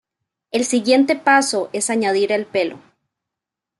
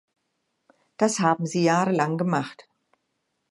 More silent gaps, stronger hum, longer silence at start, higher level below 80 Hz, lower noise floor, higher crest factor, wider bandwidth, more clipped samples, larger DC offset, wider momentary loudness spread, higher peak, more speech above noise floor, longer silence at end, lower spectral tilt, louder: neither; neither; second, 0.55 s vs 1 s; about the same, -70 dBFS vs -74 dBFS; first, -85 dBFS vs -76 dBFS; about the same, 18 dB vs 20 dB; about the same, 12 kHz vs 11.5 kHz; neither; neither; first, 8 LU vs 5 LU; first, -2 dBFS vs -6 dBFS; first, 67 dB vs 54 dB; about the same, 1 s vs 0.9 s; second, -2.5 dB/octave vs -5.5 dB/octave; first, -18 LUFS vs -23 LUFS